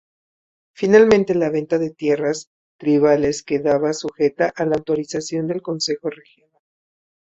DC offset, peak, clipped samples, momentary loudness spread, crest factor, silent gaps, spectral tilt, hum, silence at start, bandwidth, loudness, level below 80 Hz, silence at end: under 0.1%; -2 dBFS; under 0.1%; 11 LU; 18 dB; 2.47-2.79 s; -5.5 dB/octave; none; 0.8 s; 8 kHz; -19 LUFS; -56 dBFS; 1.1 s